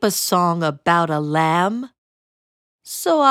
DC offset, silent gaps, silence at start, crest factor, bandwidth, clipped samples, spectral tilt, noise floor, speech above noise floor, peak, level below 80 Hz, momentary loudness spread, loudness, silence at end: under 0.1%; 1.98-2.79 s; 0 s; 18 dB; 18 kHz; under 0.1%; -4.5 dB/octave; under -90 dBFS; over 72 dB; -2 dBFS; -64 dBFS; 11 LU; -18 LUFS; 0 s